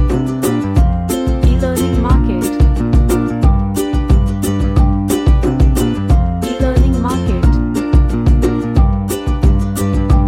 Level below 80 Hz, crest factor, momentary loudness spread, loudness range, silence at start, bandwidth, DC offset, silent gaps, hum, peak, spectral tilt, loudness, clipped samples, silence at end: -14 dBFS; 12 dB; 3 LU; 0 LU; 0 s; 16 kHz; under 0.1%; none; none; 0 dBFS; -7 dB/octave; -14 LUFS; under 0.1%; 0 s